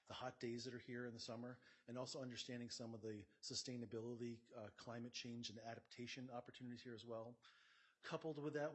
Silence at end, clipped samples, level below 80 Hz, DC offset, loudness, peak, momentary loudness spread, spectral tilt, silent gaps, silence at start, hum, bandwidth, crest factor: 0 s; under 0.1%; -90 dBFS; under 0.1%; -52 LUFS; -34 dBFS; 8 LU; -4.5 dB/octave; none; 0.05 s; none; 8.2 kHz; 18 dB